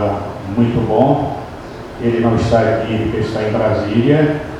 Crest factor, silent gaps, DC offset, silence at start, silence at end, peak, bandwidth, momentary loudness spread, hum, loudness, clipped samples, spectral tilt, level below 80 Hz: 16 dB; none; under 0.1%; 0 s; 0 s; 0 dBFS; 11 kHz; 10 LU; none; -16 LUFS; under 0.1%; -8 dB/octave; -36 dBFS